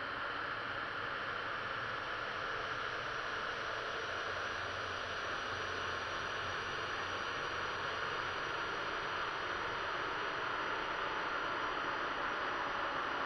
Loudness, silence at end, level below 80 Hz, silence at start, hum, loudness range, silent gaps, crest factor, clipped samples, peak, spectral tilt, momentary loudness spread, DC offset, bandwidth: -38 LUFS; 0 s; -62 dBFS; 0 s; none; 2 LU; none; 14 dB; under 0.1%; -24 dBFS; -3 dB/octave; 2 LU; under 0.1%; 11.5 kHz